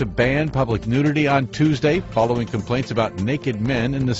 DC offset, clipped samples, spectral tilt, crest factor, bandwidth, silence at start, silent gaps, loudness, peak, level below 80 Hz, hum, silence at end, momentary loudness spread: under 0.1%; under 0.1%; -7 dB/octave; 16 dB; 8 kHz; 0 s; none; -20 LUFS; -4 dBFS; -40 dBFS; none; 0 s; 5 LU